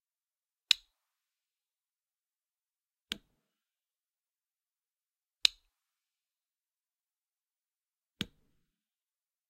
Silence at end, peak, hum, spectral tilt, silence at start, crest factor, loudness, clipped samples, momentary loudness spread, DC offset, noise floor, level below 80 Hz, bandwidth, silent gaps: 1.25 s; -2 dBFS; none; 0 dB/octave; 0.7 s; 40 dB; -32 LUFS; under 0.1%; 14 LU; under 0.1%; under -90 dBFS; -76 dBFS; 15 kHz; none